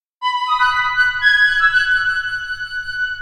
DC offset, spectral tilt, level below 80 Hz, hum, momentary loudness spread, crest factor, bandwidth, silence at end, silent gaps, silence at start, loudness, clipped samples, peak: under 0.1%; 1.5 dB/octave; -44 dBFS; none; 11 LU; 14 dB; 12.5 kHz; 0 s; none; 0.2 s; -15 LUFS; under 0.1%; -2 dBFS